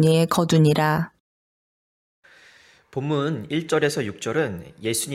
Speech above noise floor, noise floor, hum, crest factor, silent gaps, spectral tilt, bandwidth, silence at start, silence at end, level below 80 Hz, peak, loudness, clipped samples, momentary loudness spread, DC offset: 32 dB; -53 dBFS; none; 18 dB; 1.20-2.22 s; -5.5 dB/octave; 15.5 kHz; 0 s; 0 s; -58 dBFS; -6 dBFS; -22 LUFS; under 0.1%; 12 LU; under 0.1%